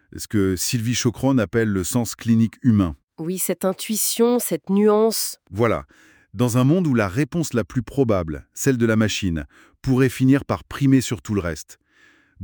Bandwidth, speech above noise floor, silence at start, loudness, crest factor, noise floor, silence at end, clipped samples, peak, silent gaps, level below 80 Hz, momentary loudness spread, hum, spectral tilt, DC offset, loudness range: over 20 kHz; 36 dB; 0.15 s; -21 LUFS; 16 dB; -56 dBFS; 0 s; under 0.1%; -6 dBFS; none; -48 dBFS; 9 LU; none; -5.5 dB/octave; under 0.1%; 2 LU